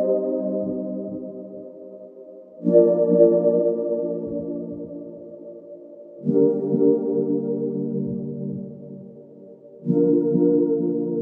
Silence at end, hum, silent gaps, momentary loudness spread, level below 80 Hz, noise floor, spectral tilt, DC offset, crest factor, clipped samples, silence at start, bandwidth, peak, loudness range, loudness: 0 s; none; none; 24 LU; -66 dBFS; -44 dBFS; -14 dB/octave; under 0.1%; 18 dB; under 0.1%; 0 s; 1.9 kHz; -4 dBFS; 5 LU; -21 LUFS